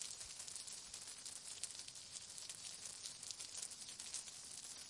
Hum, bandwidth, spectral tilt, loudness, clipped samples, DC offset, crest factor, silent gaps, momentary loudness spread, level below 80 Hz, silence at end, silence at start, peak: none; 12 kHz; 1 dB/octave; -49 LUFS; under 0.1%; under 0.1%; 26 dB; none; 3 LU; -80 dBFS; 0 s; 0 s; -26 dBFS